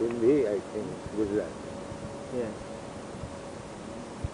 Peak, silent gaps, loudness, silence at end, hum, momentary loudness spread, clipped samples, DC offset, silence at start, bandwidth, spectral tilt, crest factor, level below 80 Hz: -14 dBFS; none; -33 LUFS; 0 s; none; 16 LU; under 0.1%; under 0.1%; 0 s; 10.5 kHz; -6.5 dB/octave; 18 dB; -52 dBFS